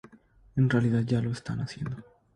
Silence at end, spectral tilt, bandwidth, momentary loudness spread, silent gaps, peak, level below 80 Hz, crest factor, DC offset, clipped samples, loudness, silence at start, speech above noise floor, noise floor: 0.35 s; -8 dB/octave; 9.8 kHz; 13 LU; none; -12 dBFS; -56 dBFS; 18 dB; under 0.1%; under 0.1%; -29 LUFS; 0.55 s; 31 dB; -58 dBFS